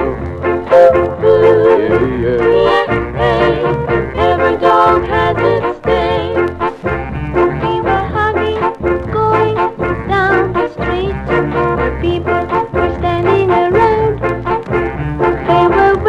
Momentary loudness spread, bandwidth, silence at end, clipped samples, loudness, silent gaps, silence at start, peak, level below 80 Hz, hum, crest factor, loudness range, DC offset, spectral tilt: 8 LU; 8 kHz; 0 s; under 0.1%; -13 LUFS; none; 0 s; 0 dBFS; -30 dBFS; none; 12 dB; 4 LU; under 0.1%; -8 dB/octave